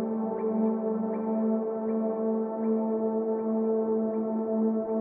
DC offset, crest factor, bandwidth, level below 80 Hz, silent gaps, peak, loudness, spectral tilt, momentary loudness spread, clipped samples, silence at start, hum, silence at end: under 0.1%; 12 dB; 2.5 kHz; -80 dBFS; none; -16 dBFS; -29 LUFS; -13.5 dB/octave; 2 LU; under 0.1%; 0 s; none; 0 s